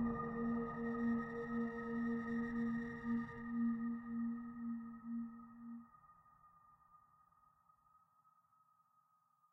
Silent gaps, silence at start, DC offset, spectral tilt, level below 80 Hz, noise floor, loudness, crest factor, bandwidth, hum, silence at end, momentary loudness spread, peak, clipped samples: none; 0 s; under 0.1%; -9 dB/octave; -68 dBFS; -77 dBFS; -42 LUFS; 14 dB; 5.8 kHz; none; 2.55 s; 9 LU; -30 dBFS; under 0.1%